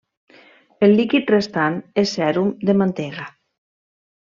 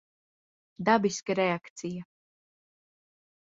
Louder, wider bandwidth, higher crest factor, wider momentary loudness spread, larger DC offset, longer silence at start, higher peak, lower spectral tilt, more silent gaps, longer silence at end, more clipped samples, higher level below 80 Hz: first, -19 LUFS vs -29 LUFS; about the same, 7.4 kHz vs 7.8 kHz; second, 16 dB vs 22 dB; about the same, 13 LU vs 13 LU; neither; about the same, 0.8 s vs 0.8 s; first, -4 dBFS vs -10 dBFS; first, -6.5 dB/octave vs -5 dB/octave; second, none vs 1.70-1.76 s; second, 1.05 s vs 1.4 s; neither; first, -62 dBFS vs -72 dBFS